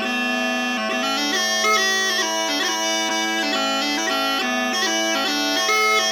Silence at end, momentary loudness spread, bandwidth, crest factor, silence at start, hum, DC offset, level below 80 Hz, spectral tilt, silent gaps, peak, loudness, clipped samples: 0 s; 4 LU; 19 kHz; 14 dB; 0 s; none; under 0.1%; -74 dBFS; -0.5 dB/octave; none; -6 dBFS; -19 LUFS; under 0.1%